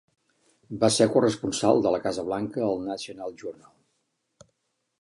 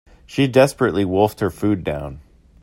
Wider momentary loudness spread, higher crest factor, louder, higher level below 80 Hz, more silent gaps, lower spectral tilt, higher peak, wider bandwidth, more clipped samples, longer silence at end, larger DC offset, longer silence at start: first, 16 LU vs 13 LU; about the same, 22 dB vs 20 dB; second, -25 LUFS vs -19 LUFS; second, -62 dBFS vs -46 dBFS; neither; second, -4.5 dB/octave vs -6.5 dB/octave; second, -6 dBFS vs 0 dBFS; second, 11.5 kHz vs 16 kHz; neither; first, 1.5 s vs 0.45 s; neither; first, 0.7 s vs 0.3 s